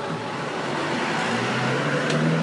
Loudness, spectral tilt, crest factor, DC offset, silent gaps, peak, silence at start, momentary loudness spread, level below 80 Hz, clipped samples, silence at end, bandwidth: -24 LUFS; -5 dB/octave; 12 dB; under 0.1%; none; -12 dBFS; 0 s; 6 LU; -64 dBFS; under 0.1%; 0 s; 11.5 kHz